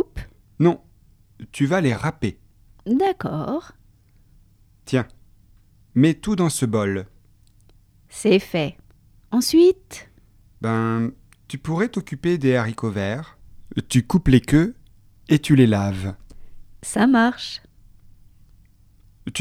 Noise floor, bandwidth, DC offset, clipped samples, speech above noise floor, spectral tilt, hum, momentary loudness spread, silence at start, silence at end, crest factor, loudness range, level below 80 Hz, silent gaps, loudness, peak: -54 dBFS; 15.5 kHz; under 0.1%; under 0.1%; 35 dB; -6 dB/octave; none; 16 LU; 0 s; 0 s; 20 dB; 5 LU; -44 dBFS; none; -21 LUFS; -2 dBFS